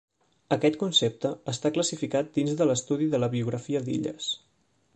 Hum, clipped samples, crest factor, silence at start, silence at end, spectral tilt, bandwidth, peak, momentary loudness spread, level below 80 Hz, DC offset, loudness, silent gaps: none; under 0.1%; 18 dB; 0.5 s; 0.6 s; -4.5 dB/octave; 9 kHz; -8 dBFS; 8 LU; -66 dBFS; under 0.1%; -27 LUFS; none